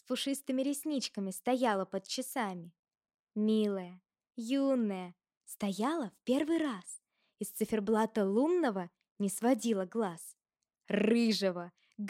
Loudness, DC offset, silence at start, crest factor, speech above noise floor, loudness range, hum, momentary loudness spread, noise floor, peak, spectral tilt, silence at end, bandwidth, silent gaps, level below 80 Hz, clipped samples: -33 LUFS; under 0.1%; 0.1 s; 18 dB; 54 dB; 3 LU; none; 16 LU; -86 dBFS; -16 dBFS; -5 dB/octave; 0 s; 16.5 kHz; 2.79-2.83 s, 3.14-3.25 s, 5.37-5.41 s, 9.11-9.16 s; -78 dBFS; under 0.1%